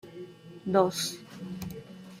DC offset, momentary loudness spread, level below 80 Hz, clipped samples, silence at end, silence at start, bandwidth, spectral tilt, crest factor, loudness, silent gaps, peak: under 0.1%; 20 LU; -64 dBFS; under 0.1%; 0 s; 0.05 s; 16 kHz; -4.5 dB/octave; 22 dB; -30 LUFS; none; -10 dBFS